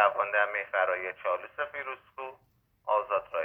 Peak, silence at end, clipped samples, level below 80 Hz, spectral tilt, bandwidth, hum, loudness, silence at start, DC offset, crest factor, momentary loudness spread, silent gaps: -8 dBFS; 0 s; under 0.1%; -74 dBFS; -5 dB/octave; 3.9 kHz; none; -30 LUFS; 0 s; under 0.1%; 22 dB; 15 LU; none